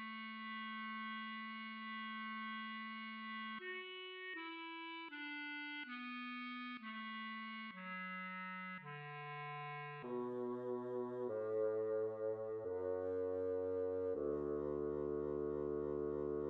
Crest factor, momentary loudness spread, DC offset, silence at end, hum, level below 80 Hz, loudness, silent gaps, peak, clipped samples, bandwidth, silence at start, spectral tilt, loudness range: 14 dB; 7 LU; under 0.1%; 0 s; none; -70 dBFS; -44 LUFS; none; -30 dBFS; under 0.1%; 5.2 kHz; 0 s; -3.5 dB/octave; 6 LU